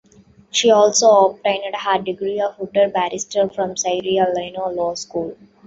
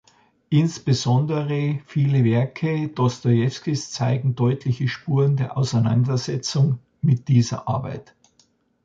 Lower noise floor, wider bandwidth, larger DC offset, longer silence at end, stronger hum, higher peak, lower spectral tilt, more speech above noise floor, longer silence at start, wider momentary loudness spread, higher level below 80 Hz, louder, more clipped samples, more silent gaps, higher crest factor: second, -50 dBFS vs -62 dBFS; about the same, 8.2 kHz vs 7.6 kHz; neither; second, 0.3 s vs 0.85 s; neither; first, -2 dBFS vs -6 dBFS; second, -2.5 dB/octave vs -6.5 dB/octave; second, 32 dB vs 42 dB; about the same, 0.55 s vs 0.5 s; first, 11 LU vs 6 LU; about the same, -60 dBFS vs -56 dBFS; first, -18 LUFS vs -22 LUFS; neither; neither; about the same, 16 dB vs 16 dB